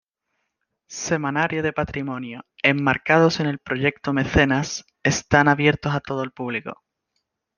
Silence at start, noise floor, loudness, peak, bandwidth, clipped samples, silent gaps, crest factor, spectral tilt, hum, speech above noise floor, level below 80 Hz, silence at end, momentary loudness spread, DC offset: 0.9 s; -77 dBFS; -21 LUFS; -2 dBFS; 10 kHz; under 0.1%; none; 20 dB; -5 dB/octave; none; 55 dB; -46 dBFS; 0.85 s; 13 LU; under 0.1%